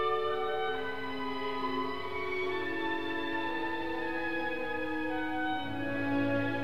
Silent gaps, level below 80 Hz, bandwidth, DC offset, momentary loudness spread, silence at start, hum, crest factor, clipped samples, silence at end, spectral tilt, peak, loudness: none; -60 dBFS; 15.5 kHz; 0.9%; 4 LU; 0 s; none; 14 dB; under 0.1%; 0 s; -6.5 dB/octave; -20 dBFS; -34 LUFS